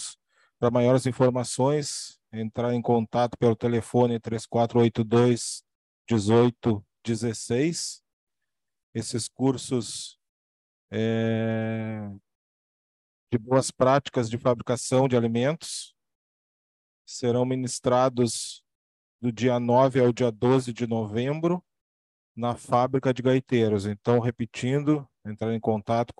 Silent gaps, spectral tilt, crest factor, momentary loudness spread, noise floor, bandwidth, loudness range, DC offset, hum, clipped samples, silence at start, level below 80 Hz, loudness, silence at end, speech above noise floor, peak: 5.75-6.05 s, 8.13-8.27 s, 8.83-8.93 s, 10.29-10.88 s, 12.35-13.27 s, 16.15-17.05 s, 18.75-19.19 s, 21.81-22.35 s; -6 dB/octave; 18 dB; 12 LU; -87 dBFS; 12 kHz; 5 LU; under 0.1%; none; under 0.1%; 0 s; -64 dBFS; -25 LUFS; 0.1 s; 62 dB; -6 dBFS